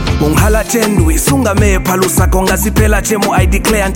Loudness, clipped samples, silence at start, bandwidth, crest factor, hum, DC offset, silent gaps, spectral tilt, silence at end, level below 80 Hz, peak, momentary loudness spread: -11 LUFS; under 0.1%; 0 s; 17 kHz; 10 dB; none; under 0.1%; none; -5 dB/octave; 0 s; -16 dBFS; 0 dBFS; 1 LU